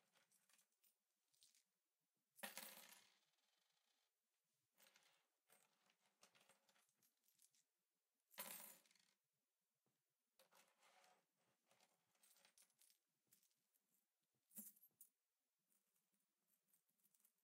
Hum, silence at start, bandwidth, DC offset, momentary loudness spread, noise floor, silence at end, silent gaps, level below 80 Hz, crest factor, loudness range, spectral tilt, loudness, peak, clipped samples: none; 0 s; 16 kHz; under 0.1%; 8 LU; under -90 dBFS; 0.15 s; none; under -90 dBFS; 34 dB; 5 LU; -0.5 dB/octave; -59 LUFS; -36 dBFS; under 0.1%